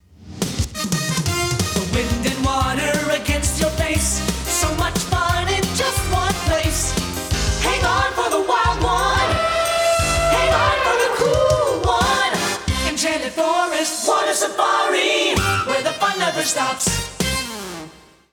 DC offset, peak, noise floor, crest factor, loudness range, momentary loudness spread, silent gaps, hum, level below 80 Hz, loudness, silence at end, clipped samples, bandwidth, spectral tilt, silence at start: under 0.1%; -4 dBFS; -42 dBFS; 14 dB; 3 LU; 5 LU; none; none; -32 dBFS; -19 LUFS; 0.35 s; under 0.1%; over 20 kHz; -3.5 dB/octave; 0.2 s